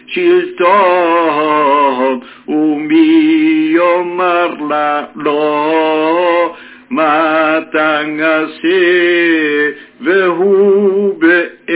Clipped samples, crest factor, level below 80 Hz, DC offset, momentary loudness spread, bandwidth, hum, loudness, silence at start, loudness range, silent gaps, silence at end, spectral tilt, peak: under 0.1%; 12 dB; -66 dBFS; under 0.1%; 6 LU; 4 kHz; none; -11 LUFS; 0.1 s; 2 LU; none; 0 s; -8.5 dB/octave; 0 dBFS